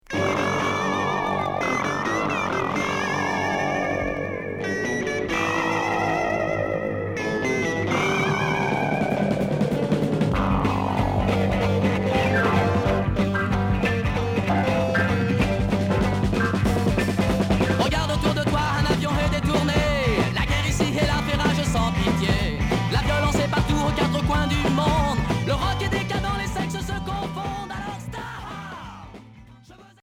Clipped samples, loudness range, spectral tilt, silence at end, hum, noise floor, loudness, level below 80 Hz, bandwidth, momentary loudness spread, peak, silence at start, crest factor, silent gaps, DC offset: under 0.1%; 3 LU; -6 dB/octave; 0.2 s; none; -48 dBFS; -23 LUFS; -34 dBFS; 16.5 kHz; 6 LU; -8 dBFS; 0.1 s; 14 dB; none; under 0.1%